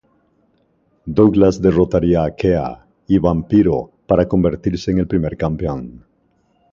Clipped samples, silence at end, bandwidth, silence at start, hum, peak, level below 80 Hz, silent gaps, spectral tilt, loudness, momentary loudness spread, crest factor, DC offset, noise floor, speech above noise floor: under 0.1%; 0.8 s; 7.4 kHz; 1.05 s; none; 0 dBFS; -36 dBFS; none; -8.5 dB/octave; -16 LUFS; 11 LU; 16 dB; under 0.1%; -60 dBFS; 45 dB